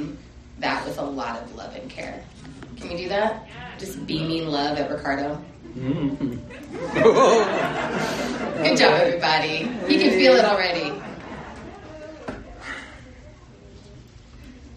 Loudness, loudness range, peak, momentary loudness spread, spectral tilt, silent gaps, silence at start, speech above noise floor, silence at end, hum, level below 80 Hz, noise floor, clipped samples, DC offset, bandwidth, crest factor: -21 LUFS; 12 LU; -4 dBFS; 22 LU; -4.5 dB/octave; none; 0 s; 23 dB; 0 s; none; -50 dBFS; -45 dBFS; under 0.1%; under 0.1%; 13 kHz; 20 dB